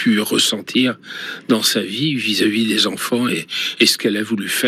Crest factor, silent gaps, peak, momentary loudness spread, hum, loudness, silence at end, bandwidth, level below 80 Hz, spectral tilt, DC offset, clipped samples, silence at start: 18 dB; none; 0 dBFS; 7 LU; none; -17 LUFS; 0 s; 16 kHz; -76 dBFS; -3 dB/octave; under 0.1%; under 0.1%; 0 s